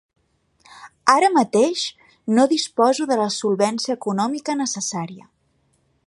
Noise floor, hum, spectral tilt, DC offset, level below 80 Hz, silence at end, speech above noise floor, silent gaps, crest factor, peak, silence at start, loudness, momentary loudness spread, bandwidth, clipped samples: -65 dBFS; none; -3.5 dB/octave; under 0.1%; -70 dBFS; 0.9 s; 46 dB; none; 20 dB; 0 dBFS; 0.75 s; -20 LUFS; 10 LU; 11.5 kHz; under 0.1%